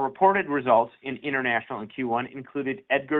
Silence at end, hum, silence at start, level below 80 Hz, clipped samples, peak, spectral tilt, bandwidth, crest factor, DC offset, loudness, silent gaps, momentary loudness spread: 0 s; none; 0 s; -68 dBFS; under 0.1%; -6 dBFS; -8.5 dB/octave; 4.2 kHz; 18 dB; under 0.1%; -26 LUFS; none; 11 LU